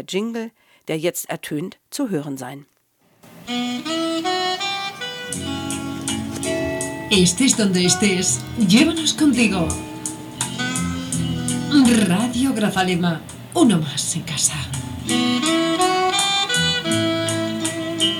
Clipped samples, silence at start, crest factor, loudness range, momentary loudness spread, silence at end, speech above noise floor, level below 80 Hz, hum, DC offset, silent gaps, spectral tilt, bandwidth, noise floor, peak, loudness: under 0.1%; 0 s; 20 dB; 8 LU; 12 LU; 0 s; 41 dB; -48 dBFS; none; under 0.1%; none; -3.5 dB/octave; 19 kHz; -60 dBFS; 0 dBFS; -20 LUFS